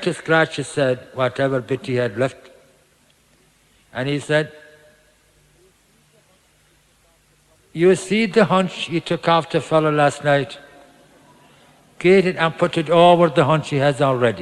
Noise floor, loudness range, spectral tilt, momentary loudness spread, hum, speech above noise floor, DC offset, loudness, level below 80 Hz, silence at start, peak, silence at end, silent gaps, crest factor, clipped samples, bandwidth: -58 dBFS; 10 LU; -6 dB/octave; 9 LU; none; 40 dB; under 0.1%; -18 LUFS; -60 dBFS; 0 s; 0 dBFS; 0 s; none; 20 dB; under 0.1%; 12 kHz